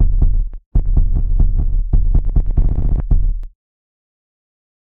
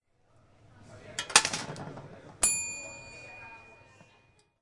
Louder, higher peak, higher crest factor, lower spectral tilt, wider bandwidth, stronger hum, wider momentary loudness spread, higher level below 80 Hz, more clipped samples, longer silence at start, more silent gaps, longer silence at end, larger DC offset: first, -20 LUFS vs -27 LUFS; second, -6 dBFS vs -2 dBFS; second, 10 dB vs 32 dB; first, -12.5 dB/octave vs 0 dB/octave; second, 1.2 kHz vs 11.5 kHz; neither; second, 6 LU vs 24 LU; first, -14 dBFS vs -62 dBFS; neither; second, 0 s vs 0.8 s; first, 0.66-0.71 s vs none; first, 1.3 s vs 0.9 s; first, 2% vs under 0.1%